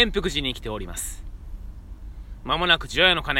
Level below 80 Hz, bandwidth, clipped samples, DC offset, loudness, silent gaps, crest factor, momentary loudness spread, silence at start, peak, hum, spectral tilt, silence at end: -36 dBFS; 17 kHz; under 0.1%; under 0.1%; -23 LUFS; none; 24 dB; 24 LU; 0 s; -2 dBFS; none; -3 dB/octave; 0 s